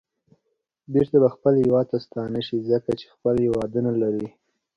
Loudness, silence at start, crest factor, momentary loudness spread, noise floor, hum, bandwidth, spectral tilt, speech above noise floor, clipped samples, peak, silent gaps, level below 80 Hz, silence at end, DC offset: -23 LUFS; 0.9 s; 18 dB; 10 LU; -76 dBFS; none; 8.8 kHz; -9 dB/octave; 54 dB; under 0.1%; -6 dBFS; none; -54 dBFS; 0.5 s; under 0.1%